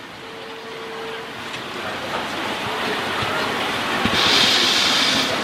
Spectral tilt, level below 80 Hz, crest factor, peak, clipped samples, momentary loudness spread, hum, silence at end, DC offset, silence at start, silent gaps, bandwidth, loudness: -2 dB/octave; -52 dBFS; 18 dB; -4 dBFS; under 0.1%; 18 LU; none; 0 s; under 0.1%; 0 s; none; 16 kHz; -19 LUFS